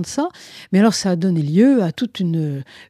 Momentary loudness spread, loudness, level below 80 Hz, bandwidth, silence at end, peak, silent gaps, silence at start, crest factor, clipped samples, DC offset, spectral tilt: 11 LU; -18 LUFS; -62 dBFS; 13 kHz; 0.05 s; -2 dBFS; none; 0 s; 16 dB; under 0.1%; under 0.1%; -6 dB/octave